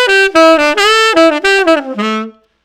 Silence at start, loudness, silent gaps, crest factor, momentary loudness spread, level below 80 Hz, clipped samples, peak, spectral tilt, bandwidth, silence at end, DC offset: 0 s; -9 LUFS; none; 10 dB; 10 LU; -46 dBFS; 0.7%; 0 dBFS; -2.5 dB/octave; 17 kHz; 0.35 s; under 0.1%